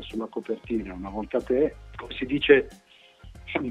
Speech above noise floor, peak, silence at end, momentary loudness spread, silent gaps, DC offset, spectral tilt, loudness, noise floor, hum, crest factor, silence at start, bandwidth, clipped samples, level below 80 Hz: 24 dB; -4 dBFS; 0 s; 18 LU; none; under 0.1%; -6.5 dB/octave; -26 LUFS; -49 dBFS; none; 22 dB; 0 s; 9.4 kHz; under 0.1%; -48 dBFS